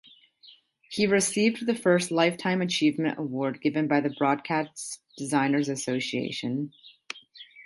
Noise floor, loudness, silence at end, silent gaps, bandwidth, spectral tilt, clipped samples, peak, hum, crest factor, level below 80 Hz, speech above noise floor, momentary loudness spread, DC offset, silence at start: -56 dBFS; -26 LUFS; 0 s; none; 11.5 kHz; -4.5 dB/octave; under 0.1%; -8 dBFS; none; 18 dB; -70 dBFS; 30 dB; 14 LU; under 0.1%; 0.45 s